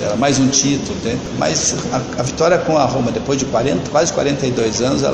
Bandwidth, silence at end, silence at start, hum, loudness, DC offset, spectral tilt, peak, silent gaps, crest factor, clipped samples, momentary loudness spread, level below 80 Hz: 9.4 kHz; 0 s; 0 s; none; -16 LUFS; under 0.1%; -4 dB/octave; 0 dBFS; none; 16 dB; under 0.1%; 7 LU; -40 dBFS